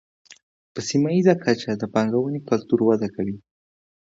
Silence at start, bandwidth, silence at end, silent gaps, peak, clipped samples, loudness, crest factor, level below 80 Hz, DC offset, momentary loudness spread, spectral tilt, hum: 0.75 s; 7.8 kHz; 0.75 s; none; -4 dBFS; under 0.1%; -22 LUFS; 20 dB; -60 dBFS; under 0.1%; 12 LU; -6 dB/octave; none